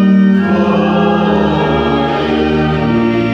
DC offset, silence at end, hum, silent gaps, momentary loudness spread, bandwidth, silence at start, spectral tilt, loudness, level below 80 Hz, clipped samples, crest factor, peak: under 0.1%; 0 s; none; none; 3 LU; 6.8 kHz; 0 s; -8 dB/octave; -12 LUFS; -32 dBFS; under 0.1%; 10 dB; -2 dBFS